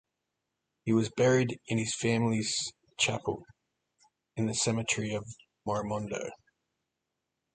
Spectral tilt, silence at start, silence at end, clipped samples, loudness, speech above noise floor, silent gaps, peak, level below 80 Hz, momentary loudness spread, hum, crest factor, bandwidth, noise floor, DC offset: -4.5 dB/octave; 0.85 s; 1.2 s; under 0.1%; -31 LUFS; 55 dB; none; -14 dBFS; -64 dBFS; 13 LU; none; 20 dB; 9.6 kHz; -85 dBFS; under 0.1%